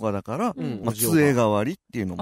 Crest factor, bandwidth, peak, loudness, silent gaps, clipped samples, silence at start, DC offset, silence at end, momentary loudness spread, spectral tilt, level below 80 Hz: 14 dB; 16 kHz; -8 dBFS; -23 LUFS; none; under 0.1%; 0 s; under 0.1%; 0 s; 11 LU; -5.5 dB/octave; -56 dBFS